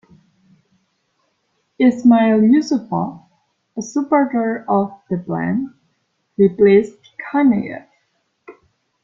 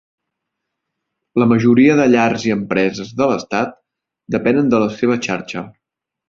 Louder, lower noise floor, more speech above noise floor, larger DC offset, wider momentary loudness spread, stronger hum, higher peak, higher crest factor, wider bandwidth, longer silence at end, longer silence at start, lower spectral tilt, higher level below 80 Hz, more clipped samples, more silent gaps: about the same, -16 LUFS vs -16 LUFS; second, -68 dBFS vs -78 dBFS; second, 52 dB vs 63 dB; neither; first, 18 LU vs 12 LU; neither; about the same, -2 dBFS vs -2 dBFS; about the same, 16 dB vs 16 dB; about the same, 7.4 kHz vs 7.4 kHz; about the same, 0.5 s vs 0.6 s; first, 1.8 s vs 1.35 s; about the same, -7.5 dB/octave vs -6.5 dB/octave; second, -60 dBFS vs -54 dBFS; neither; neither